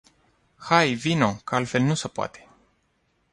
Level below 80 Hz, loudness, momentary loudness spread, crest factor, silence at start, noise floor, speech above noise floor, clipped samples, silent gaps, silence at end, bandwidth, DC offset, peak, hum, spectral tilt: -60 dBFS; -23 LUFS; 12 LU; 22 dB; 0.6 s; -69 dBFS; 46 dB; under 0.1%; none; 0.95 s; 11.5 kHz; under 0.1%; -4 dBFS; none; -5 dB/octave